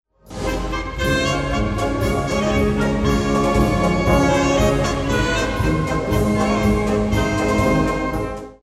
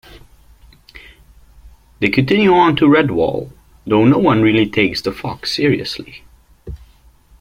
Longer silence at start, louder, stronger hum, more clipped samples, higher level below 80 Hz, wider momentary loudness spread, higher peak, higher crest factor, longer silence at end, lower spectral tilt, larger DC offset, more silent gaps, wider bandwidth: about the same, 0.25 s vs 0.15 s; second, -19 LUFS vs -14 LUFS; neither; neither; first, -28 dBFS vs -42 dBFS; second, 7 LU vs 24 LU; about the same, -2 dBFS vs -2 dBFS; about the same, 16 dB vs 16 dB; second, 0.1 s vs 0.65 s; about the same, -6 dB/octave vs -6.5 dB/octave; neither; neither; about the same, 15.5 kHz vs 15.5 kHz